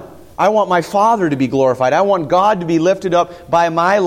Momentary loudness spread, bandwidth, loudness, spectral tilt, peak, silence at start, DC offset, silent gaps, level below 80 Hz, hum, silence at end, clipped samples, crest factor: 3 LU; 16 kHz; -14 LUFS; -6 dB/octave; -2 dBFS; 0 s; under 0.1%; none; -50 dBFS; none; 0 s; under 0.1%; 12 dB